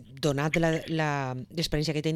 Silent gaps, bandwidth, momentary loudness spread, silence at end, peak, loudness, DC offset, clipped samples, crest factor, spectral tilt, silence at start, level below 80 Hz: none; 15 kHz; 6 LU; 0 s; -12 dBFS; -28 LUFS; under 0.1%; under 0.1%; 16 dB; -5.5 dB/octave; 0 s; -46 dBFS